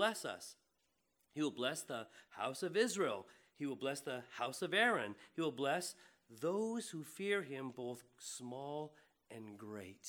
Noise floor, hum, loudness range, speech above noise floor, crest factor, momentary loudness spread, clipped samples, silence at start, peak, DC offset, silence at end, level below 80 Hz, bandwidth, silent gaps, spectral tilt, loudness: -83 dBFS; none; 5 LU; 41 dB; 22 dB; 15 LU; under 0.1%; 0 s; -20 dBFS; under 0.1%; 0 s; under -90 dBFS; 19.5 kHz; none; -3.5 dB/octave; -41 LUFS